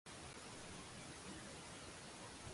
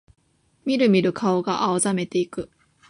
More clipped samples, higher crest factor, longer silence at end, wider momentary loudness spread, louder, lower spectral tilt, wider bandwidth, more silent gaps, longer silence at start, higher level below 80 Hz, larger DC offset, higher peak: neither; about the same, 14 dB vs 16 dB; second, 0 s vs 0.45 s; second, 1 LU vs 14 LU; second, -53 LUFS vs -22 LUFS; second, -3 dB/octave vs -5 dB/octave; about the same, 11.5 kHz vs 11.5 kHz; neither; second, 0.05 s vs 0.65 s; second, -68 dBFS vs -60 dBFS; neither; second, -40 dBFS vs -6 dBFS